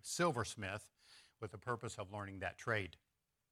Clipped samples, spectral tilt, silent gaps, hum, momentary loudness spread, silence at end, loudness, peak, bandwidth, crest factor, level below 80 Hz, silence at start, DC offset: under 0.1%; -4 dB/octave; none; none; 17 LU; 0.6 s; -43 LUFS; -24 dBFS; 16 kHz; 20 dB; -72 dBFS; 0.05 s; under 0.1%